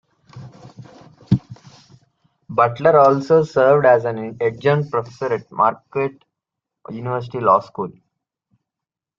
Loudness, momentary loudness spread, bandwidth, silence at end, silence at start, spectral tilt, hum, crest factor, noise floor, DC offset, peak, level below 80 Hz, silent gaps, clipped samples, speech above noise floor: -18 LUFS; 14 LU; 7.4 kHz; 1.3 s; 0.35 s; -8 dB/octave; none; 18 dB; -86 dBFS; under 0.1%; -2 dBFS; -56 dBFS; none; under 0.1%; 69 dB